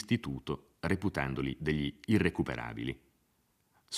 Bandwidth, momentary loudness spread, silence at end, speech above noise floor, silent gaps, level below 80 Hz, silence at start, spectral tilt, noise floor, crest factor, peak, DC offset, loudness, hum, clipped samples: 15 kHz; 10 LU; 0 s; 40 dB; none; -54 dBFS; 0 s; -6 dB/octave; -74 dBFS; 20 dB; -14 dBFS; under 0.1%; -34 LUFS; none; under 0.1%